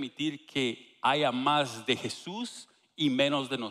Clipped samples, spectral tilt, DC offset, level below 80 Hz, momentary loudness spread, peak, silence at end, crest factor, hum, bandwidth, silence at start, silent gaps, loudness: under 0.1%; -4 dB/octave; under 0.1%; -74 dBFS; 12 LU; -12 dBFS; 0 s; 20 dB; none; 13.5 kHz; 0 s; none; -30 LUFS